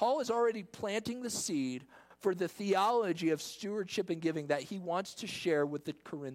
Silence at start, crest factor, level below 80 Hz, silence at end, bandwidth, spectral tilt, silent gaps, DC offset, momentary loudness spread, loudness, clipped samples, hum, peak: 0 s; 16 dB; -76 dBFS; 0 s; 16.5 kHz; -4.5 dB/octave; none; under 0.1%; 9 LU; -35 LUFS; under 0.1%; none; -18 dBFS